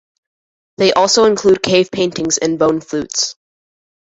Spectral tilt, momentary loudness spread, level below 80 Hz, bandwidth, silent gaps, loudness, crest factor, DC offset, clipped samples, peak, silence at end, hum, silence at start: -3 dB/octave; 8 LU; -52 dBFS; 8 kHz; none; -14 LUFS; 16 dB; under 0.1%; under 0.1%; 0 dBFS; 0.8 s; none; 0.8 s